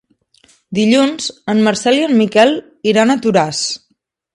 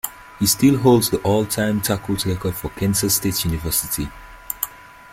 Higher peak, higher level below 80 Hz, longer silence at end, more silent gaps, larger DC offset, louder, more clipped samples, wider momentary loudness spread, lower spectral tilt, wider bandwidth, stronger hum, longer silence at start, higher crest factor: about the same, 0 dBFS vs -2 dBFS; second, -60 dBFS vs -40 dBFS; first, 0.55 s vs 0.3 s; neither; neither; first, -14 LUFS vs -19 LUFS; neither; about the same, 9 LU vs 11 LU; about the same, -4.5 dB/octave vs -4.5 dB/octave; second, 11 kHz vs 16.5 kHz; neither; first, 0.7 s vs 0.05 s; about the same, 14 dB vs 18 dB